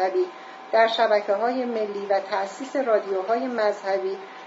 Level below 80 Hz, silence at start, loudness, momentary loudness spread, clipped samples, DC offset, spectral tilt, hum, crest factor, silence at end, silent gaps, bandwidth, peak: -86 dBFS; 0 s; -24 LUFS; 8 LU; under 0.1%; under 0.1%; -4 dB/octave; none; 16 dB; 0 s; none; 7.8 kHz; -6 dBFS